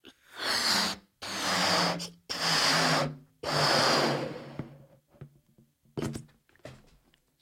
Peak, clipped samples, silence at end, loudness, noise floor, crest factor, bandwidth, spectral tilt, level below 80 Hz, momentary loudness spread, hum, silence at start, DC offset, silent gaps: -12 dBFS; under 0.1%; 0.65 s; -27 LUFS; -66 dBFS; 18 dB; 16.5 kHz; -2.5 dB/octave; -64 dBFS; 19 LU; none; 0.05 s; under 0.1%; none